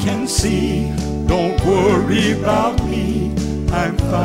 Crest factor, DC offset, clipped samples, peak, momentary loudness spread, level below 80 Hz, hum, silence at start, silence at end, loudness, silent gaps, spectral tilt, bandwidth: 14 dB; under 0.1%; under 0.1%; -2 dBFS; 6 LU; -26 dBFS; none; 0 s; 0 s; -17 LUFS; none; -5.5 dB/octave; 16 kHz